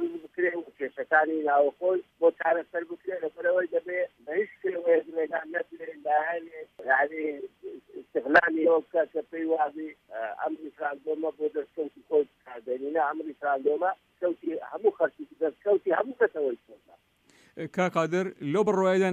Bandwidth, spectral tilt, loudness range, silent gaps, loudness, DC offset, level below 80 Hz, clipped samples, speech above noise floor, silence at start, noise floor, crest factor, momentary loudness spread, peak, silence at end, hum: 8.8 kHz; -6.5 dB/octave; 4 LU; none; -28 LUFS; under 0.1%; -74 dBFS; under 0.1%; 35 dB; 0 s; -62 dBFS; 22 dB; 12 LU; -6 dBFS; 0 s; none